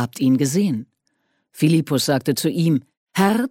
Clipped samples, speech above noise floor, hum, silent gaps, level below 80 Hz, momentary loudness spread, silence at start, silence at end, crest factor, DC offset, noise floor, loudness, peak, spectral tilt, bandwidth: under 0.1%; 51 dB; none; 2.97-3.06 s; -62 dBFS; 6 LU; 0 s; 0 s; 16 dB; under 0.1%; -69 dBFS; -20 LUFS; -4 dBFS; -5.5 dB/octave; 17 kHz